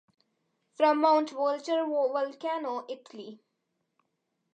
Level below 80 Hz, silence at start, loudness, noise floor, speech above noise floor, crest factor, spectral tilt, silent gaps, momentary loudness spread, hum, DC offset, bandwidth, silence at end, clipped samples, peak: under -90 dBFS; 0.8 s; -28 LUFS; -80 dBFS; 52 dB; 20 dB; -4 dB/octave; none; 19 LU; none; under 0.1%; 8.8 kHz; 1.2 s; under 0.1%; -10 dBFS